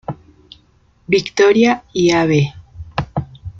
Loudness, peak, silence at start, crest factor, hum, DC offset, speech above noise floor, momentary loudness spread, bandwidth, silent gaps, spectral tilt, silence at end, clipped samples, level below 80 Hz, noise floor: -16 LUFS; -2 dBFS; 0.1 s; 16 dB; none; under 0.1%; 40 dB; 17 LU; 7.6 kHz; none; -5.5 dB/octave; 0.1 s; under 0.1%; -44 dBFS; -54 dBFS